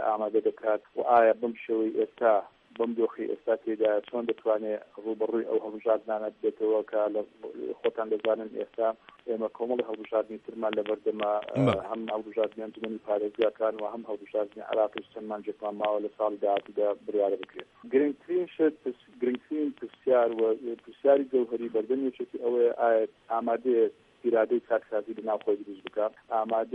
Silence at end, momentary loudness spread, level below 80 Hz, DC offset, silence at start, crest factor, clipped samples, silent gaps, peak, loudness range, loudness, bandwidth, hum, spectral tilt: 0 s; 10 LU; -72 dBFS; under 0.1%; 0 s; 18 dB; under 0.1%; none; -10 dBFS; 4 LU; -29 LUFS; 4.4 kHz; none; -8 dB/octave